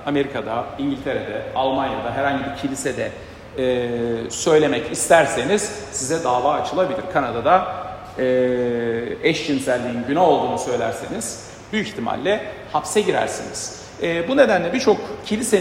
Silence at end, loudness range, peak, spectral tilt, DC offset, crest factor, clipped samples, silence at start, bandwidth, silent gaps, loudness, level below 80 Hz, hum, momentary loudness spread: 0 s; 4 LU; 0 dBFS; -4 dB/octave; under 0.1%; 20 dB; under 0.1%; 0 s; 16 kHz; none; -21 LUFS; -50 dBFS; none; 10 LU